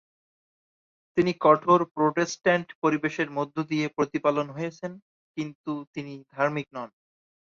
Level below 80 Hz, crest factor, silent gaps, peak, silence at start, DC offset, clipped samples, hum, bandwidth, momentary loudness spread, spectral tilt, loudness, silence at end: -68 dBFS; 22 dB; 1.91-1.95 s, 2.75-2.82 s, 5.02-5.34 s, 5.55-5.64 s, 5.87-5.94 s; -6 dBFS; 1.15 s; under 0.1%; under 0.1%; none; 7.6 kHz; 17 LU; -6 dB/octave; -26 LUFS; 0.6 s